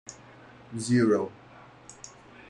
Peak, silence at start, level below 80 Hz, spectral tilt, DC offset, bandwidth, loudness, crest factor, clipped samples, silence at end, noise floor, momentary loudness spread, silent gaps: -12 dBFS; 0.05 s; -66 dBFS; -6 dB/octave; under 0.1%; 11 kHz; -26 LUFS; 18 dB; under 0.1%; 0.1 s; -51 dBFS; 26 LU; none